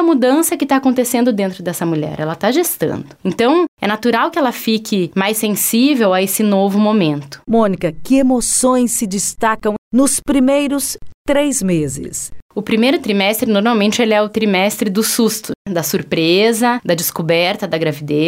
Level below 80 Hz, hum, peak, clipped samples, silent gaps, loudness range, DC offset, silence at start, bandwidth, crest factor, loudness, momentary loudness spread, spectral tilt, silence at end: -46 dBFS; none; -2 dBFS; under 0.1%; 3.68-3.77 s, 9.78-9.91 s, 11.14-11.25 s, 12.42-12.49 s, 15.56-15.65 s; 2 LU; under 0.1%; 0 s; 16.5 kHz; 12 dB; -15 LUFS; 7 LU; -4 dB/octave; 0 s